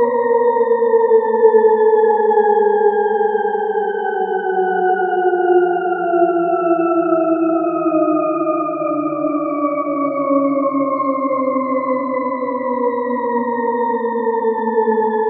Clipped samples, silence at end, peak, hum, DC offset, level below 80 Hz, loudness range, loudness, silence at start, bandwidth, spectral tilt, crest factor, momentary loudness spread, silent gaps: under 0.1%; 0 s; 0 dBFS; none; under 0.1%; -84 dBFS; 5 LU; -16 LUFS; 0 s; 3.9 kHz; -11.5 dB/octave; 16 dB; 6 LU; none